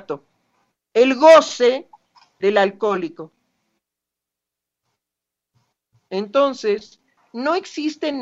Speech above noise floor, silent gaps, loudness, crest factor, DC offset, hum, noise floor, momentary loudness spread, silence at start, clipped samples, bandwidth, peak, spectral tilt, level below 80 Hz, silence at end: 68 dB; none; -18 LUFS; 20 dB; under 0.1%; 60 Hz at -65 dBFS; -85 dBFS; 20 LU; 0.1 s; under 0.1%; 8.8 kHz; 0 dBFS; -4 dB/octave; -72 dBFS; 0 s